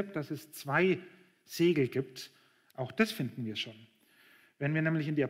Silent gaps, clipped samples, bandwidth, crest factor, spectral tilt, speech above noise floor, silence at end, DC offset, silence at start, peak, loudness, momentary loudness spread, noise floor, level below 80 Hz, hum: none; under 0.1%; 16 kHz; 18 dB; -6 dB/octave; 31 dB; 0 s; under 0.1%; 0 s; -14 dBFS; -33 LUFS; 15 LU; -63 dBFS; -78 dBFS; none